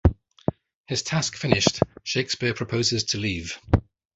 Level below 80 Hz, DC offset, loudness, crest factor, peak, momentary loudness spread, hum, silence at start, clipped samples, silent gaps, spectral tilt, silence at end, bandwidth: -34 dBFS; under 0.1%; -25 LUFS; 24 dB; 0 dBFS; 10 LU; none; 0.05 s; under 0.1%; 0.75-0.84 s; -4 dB/octave; 0.35 s; 8.2 kHz